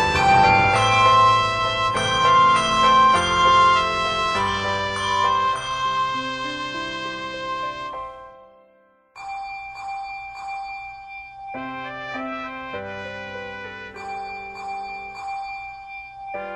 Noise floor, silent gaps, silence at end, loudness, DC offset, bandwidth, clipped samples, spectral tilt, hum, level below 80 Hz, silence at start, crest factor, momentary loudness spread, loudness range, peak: -57 dBFS; none; 0 s; -19 LUFS; under 0.1%; 11.5 kHz; under 0.1%; -3.5 dB/octave; none; -46 dBFS; 0 s; 18 dB; 19 LU; 16 LU; -4 dBFS